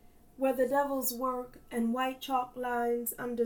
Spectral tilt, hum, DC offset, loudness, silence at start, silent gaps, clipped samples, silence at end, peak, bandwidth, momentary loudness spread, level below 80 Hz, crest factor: -3.5 dB/octave; none; under 0.1%; -32 LUFS; 0.4 s; none; under 0.1%; 0 s; -18 dBFS; 19 kHz; 6 LU; -62 dBFS; 16 dB